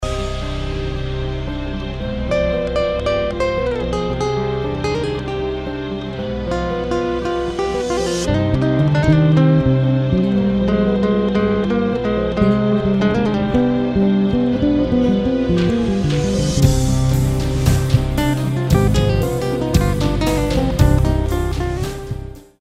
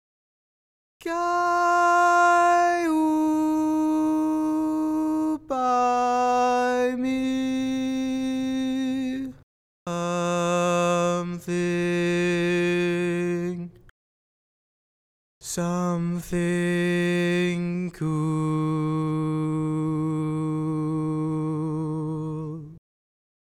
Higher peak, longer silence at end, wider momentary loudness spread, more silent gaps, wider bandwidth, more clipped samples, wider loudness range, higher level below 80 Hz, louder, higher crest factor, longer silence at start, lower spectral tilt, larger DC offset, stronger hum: first, 0 dBFS vs -10 dBFS; second, 0.2 s vs 0.8 s; about the same, 9 LU vs 8 LU; second, none vs 9.43-9.86 s, 13.91-15.41 s; about the same, 15.5 kHz vs 15.5 kHz; neither; about the same, 6 LU vs 7 LU; first, -26 dBFS vs -56 dBFS; first, -18 LUFS vs -24 LUFS; about the same, 16 dB vs 14 dB; second, 0 s vs 1.05 s; about the same, -7 dB/octave vs -6 dB/octave; neither; neither